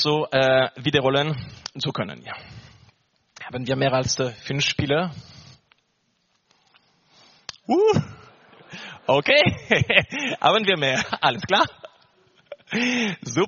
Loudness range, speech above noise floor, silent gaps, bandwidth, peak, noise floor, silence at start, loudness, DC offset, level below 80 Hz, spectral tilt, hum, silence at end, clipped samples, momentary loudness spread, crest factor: 8 LU; 48 dB; none; 7.2 kHz; 0 dBFS; -70 dBFS; 0 s; -21 LUFS; under 0.1%; -56 dBFS; -3 dB/octave; none; 0 s; under 0.1%; 20 LU; 24 dB